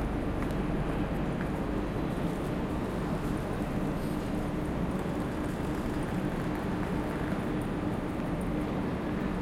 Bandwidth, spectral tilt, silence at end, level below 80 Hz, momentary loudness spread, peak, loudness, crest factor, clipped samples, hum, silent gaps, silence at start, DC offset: 16.5 kHz; -7.5 dB/octave; 0 s; -40 dBFS; 1 LU; -18 dBFS; -33 LUFS; 12 dB; under 0.1%; none; none; 0 s; under 0.1%